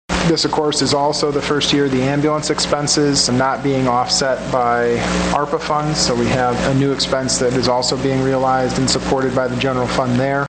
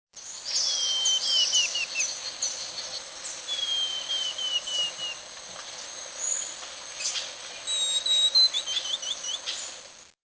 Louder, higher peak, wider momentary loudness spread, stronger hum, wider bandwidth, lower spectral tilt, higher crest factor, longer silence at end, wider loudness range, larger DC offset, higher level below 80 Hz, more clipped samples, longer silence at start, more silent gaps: first, -16 LUFS vs -25 LUFS; first, -2 dBFS vs -12 dBFS; second, 3 LU vs 16 LU; neither; first, 9.6 kHz vs 8 kHz; first, -4 dB/octave vs 3 dB/octave; about the same, 14 dB vs 18 dB; second, 0 s vs 0.2 s; second, 1 LU vs 5 LU; neither; first, -38 dBFS vs -72 dBFS; neither; about the same, 0.1 s vs 0.15 s; neither